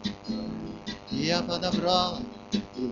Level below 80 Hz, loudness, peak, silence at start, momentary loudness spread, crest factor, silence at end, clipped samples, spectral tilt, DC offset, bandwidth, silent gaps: -52 dBFS; -29 LUFS; -8 dBFS; 0 s; 13 LU; 22 dB; 0 s; under 0.1%; -5 dB/octave; under 0.1%; 7.6 kHz; none